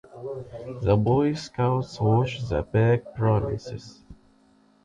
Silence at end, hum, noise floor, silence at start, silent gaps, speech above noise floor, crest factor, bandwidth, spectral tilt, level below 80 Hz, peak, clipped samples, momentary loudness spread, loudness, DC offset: 0.7 s; none; -60 dBFS; 0.15 s; none; 36 dB; 16 dB; 7.8 kHz; -8 dB/octave; -44 dBFS; -8 dBFS; under 0.1%; 15 LU; -24 LUFS; under 0.1%